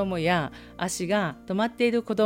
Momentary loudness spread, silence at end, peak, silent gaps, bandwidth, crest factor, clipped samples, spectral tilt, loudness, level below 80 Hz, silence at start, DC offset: 7 LU; 0 s; -10 dBFS; none; 16.5 kHz; 16 dB; under 0.1%; -5 dB/octave; -27 LUFS; -54 dBFS; 0 s; under 0.1%